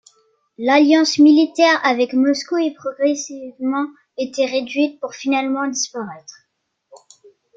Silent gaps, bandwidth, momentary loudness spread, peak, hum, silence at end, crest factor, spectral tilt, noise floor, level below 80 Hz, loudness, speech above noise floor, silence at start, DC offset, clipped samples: none; 7.8 kHz; 14 LU; -2 dBFS; none; 1.25 s; 16 dB; -2.5 dB/octave; -71 dBFS; -70 dBFS; -17 LUFS; 54 dB; 0.6 s; under 0.1%; under 0.1%